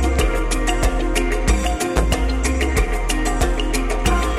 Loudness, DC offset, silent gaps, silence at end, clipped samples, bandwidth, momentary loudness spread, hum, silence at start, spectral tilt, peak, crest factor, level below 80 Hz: -20 LUFS; under 0.1%; none; 0 s; under 0.1%; 15 kHz; 2 LU; none; 0 s; -4.5 dB/octave; -4 dBFS; 14 dB; -20 dBFS